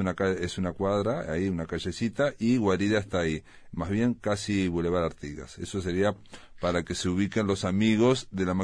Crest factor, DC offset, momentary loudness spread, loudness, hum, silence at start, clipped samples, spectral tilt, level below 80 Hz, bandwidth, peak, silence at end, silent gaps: 18 dB; under 0.1%; 9 LU; -28 LUFS; none; 0 s; under 0.1%; -6 dB/octave; -50 dBFS; 10.5 kHz; -10 dBFS; 0 s; none